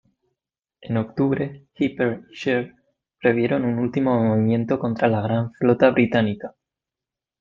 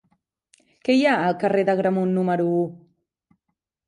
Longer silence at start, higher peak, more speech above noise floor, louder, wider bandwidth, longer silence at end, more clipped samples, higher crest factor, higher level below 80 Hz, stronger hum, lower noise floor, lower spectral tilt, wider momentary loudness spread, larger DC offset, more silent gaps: about the same, 0.8 s vs 0.85 s; first, -2 dBFS vs -6 dBFS; first, 67 dB vs 59 dB; about the same, -22 LUFS vs -21 LUFS; second, 7.2 kHz vs 10.5 kHz; second, 0.9 s vs 1.1 s; neither; about the same, 20 dB vs 16 dB; first, -58 dBFS vs -70 dBFS; neither; first, -88 dBFS vs -79 dBFS; first, -8.5 dB/octave vs -7 dB/octave; first, 9 LU vs 6 LU; neither; neither